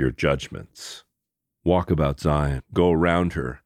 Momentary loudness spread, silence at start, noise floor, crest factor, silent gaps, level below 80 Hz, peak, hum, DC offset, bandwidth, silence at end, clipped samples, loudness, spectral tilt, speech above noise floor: 18 LU; 0 s; -83 dBFS; 18 dB; none; -36 dBFS; -4 dBFS; none; under 0.1%; 14 kHz; 0.1 s; under 0.1%; -22 LUFS; -7 dB/octave; 60 dB